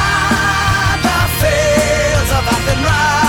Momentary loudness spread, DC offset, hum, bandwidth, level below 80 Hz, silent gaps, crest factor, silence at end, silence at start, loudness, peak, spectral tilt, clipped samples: 2 LU; under 0.1%; none; 18 kHz; -24 dBFS; none; 10 dB; 0 s; 0 s; -13 LUFS; -2 dBFS; -4 dB/octave; under 0.1%